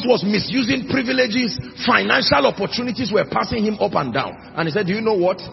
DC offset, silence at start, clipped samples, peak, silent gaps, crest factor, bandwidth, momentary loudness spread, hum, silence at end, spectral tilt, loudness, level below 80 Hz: under 0.1%; 0 s; under 0.1%; 0 dBFS; none; 18 dB; 6 kHz; 8 LU; none; 0 s; -5.5 dB/octave; -19 LUFS; -50 dBFS